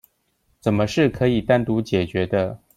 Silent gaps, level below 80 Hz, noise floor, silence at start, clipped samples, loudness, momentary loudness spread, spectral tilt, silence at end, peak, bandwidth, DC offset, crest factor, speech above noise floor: none; -46 dBFS; -67 dBFS; 0.65 s; under 0.1%; -21 LUFS; 5 LU; -7 dB/octave; 0.2 s; -4 dBFS; 15.5 kHz; under 0.1%; 18 dB; 47 dB